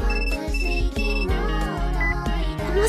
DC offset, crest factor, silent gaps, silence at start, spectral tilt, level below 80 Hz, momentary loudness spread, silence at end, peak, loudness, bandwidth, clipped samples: under 0.1%; 14 dB; none; 0 s; -5.5 dB/octave; -24 dBFS; 2 LU; 0 s; -8 dBFS; -25 LUFS; 12.5 kHz; under 0.1%